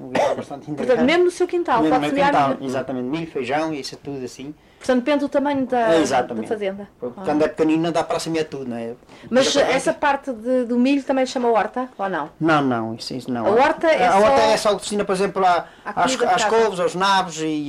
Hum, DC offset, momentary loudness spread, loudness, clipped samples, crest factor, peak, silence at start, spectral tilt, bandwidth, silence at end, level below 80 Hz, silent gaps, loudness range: none; under 0.1%; 12 LU; -20 LUFS; under 0.1%; 14 dB; -6 dBFS; 0 s; -4.5 dB/octave; 14.5 kHz; 0 s; -54 dBFS; none; 4 LU